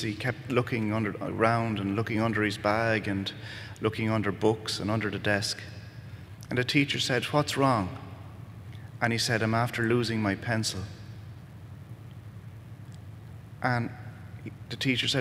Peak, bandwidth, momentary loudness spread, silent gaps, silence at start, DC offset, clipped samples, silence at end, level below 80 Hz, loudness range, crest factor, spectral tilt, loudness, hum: -8 dBFS; 16 kHz; 20 LU; none; 0 s; under 0.1%; under 0.1%; 0 s; -60 dBFS; 9 LU; 22 dB; -5 dB/octave; -28 LUFS; none